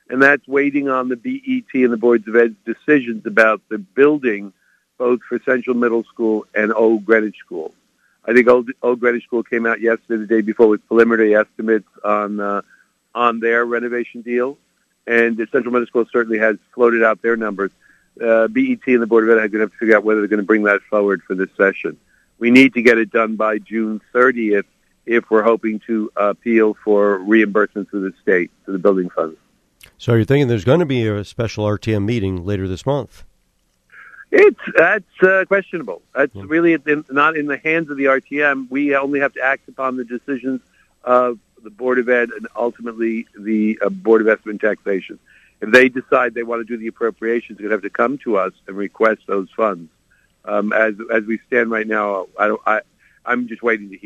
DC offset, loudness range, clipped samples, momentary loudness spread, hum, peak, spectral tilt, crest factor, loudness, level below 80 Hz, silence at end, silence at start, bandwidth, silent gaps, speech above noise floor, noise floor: under 0.1%; 4 LU; under 0.1%; 11 LU; none; 0 dBFS; -7 dB/octave; 18 dB; -17 LUFS; -58 dBFS; 0.1 s; 0.1 s; 10 kHz; none; 46 dB; -63 dBFS